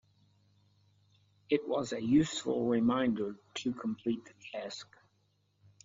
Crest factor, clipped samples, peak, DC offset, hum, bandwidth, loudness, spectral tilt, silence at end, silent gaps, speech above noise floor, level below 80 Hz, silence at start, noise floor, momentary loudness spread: 20 dB; under 0.1%; -16 dBFS; under 0.1%; 50 Hz at -65 dBFS; 7.8 kHz; -33 LUFS; -5 dB/octave; 1 s; none; 42 dB; -66 dBFS; 1.5 s; -74 dBFS; 14 LU